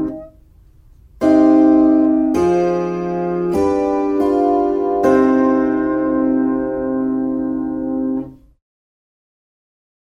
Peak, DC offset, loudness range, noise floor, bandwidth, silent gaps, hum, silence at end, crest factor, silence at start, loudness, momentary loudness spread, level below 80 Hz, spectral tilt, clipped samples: -2 dBFS; under 0.1%; 7 LU; -47 dBFS; 7.2 kHz; none; none; 1.7 s; 14 dB; 0 s; -16 LUFS; 10 LU; -46 dBFS; -8 dB/octave; under 0.1%